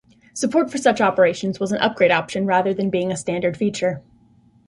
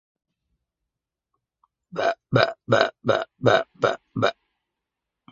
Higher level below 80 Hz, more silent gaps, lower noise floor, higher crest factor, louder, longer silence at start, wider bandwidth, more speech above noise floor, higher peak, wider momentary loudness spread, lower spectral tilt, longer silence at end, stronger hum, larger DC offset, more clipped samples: about the same, -58 dBFS vs -62 dBFS; neither; second, -54 dBFS vs -86 dBFS; second, 16 dB vs 26 dB; first, -20 LUFS vs -23 LUFS; second, 0.35 s vs 1.95 s; first, 11.5 kHz vs 7.6 kHz; second, 35 dB vs 63 dB; second, -4 dBFS vs 0 dBFS; first, 8 LU vs 5 LU; about the same, -5 dB/octave vs -5.5 dB/octave; second, 0.65 s vs 1 s; neither; neither; neither